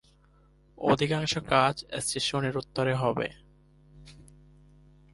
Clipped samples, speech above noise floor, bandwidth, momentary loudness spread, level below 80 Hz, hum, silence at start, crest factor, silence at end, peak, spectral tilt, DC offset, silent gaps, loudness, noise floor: under 0.1%; 33 dB; 11.5 kHz; 8 LU; -56 dBFS; none; 0.8 s; 22 dB; 0.9 s; -8 dBFS; -4.5 dB/octave; under 0.1%; none; -28 LUFS; -61 dBFS